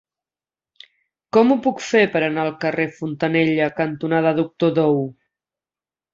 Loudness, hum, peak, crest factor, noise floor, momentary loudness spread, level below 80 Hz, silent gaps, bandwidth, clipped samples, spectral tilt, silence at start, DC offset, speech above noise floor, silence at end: -19 LUFS; none; -2 dBFS; 20 dB; under -90 dBFS; 7 LU; -64 dBFS; none; 7.6 kHz; under 0.1%; -6.5 dB/octave; 1.35 s; under 0.1%; over 71 dB; 1 s